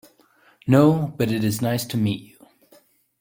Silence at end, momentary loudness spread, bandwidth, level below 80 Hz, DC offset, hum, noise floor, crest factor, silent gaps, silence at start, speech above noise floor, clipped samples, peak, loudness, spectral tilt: 0.95 s; 11 LU; 17 kHz; -56 dBFS; under 0.1%; none; -58 dBFS; 20 dB; none; 0.65 s; 38 dB; under 0.1%; -2 dBFS; -21 LUFS; -6.5 dB/octave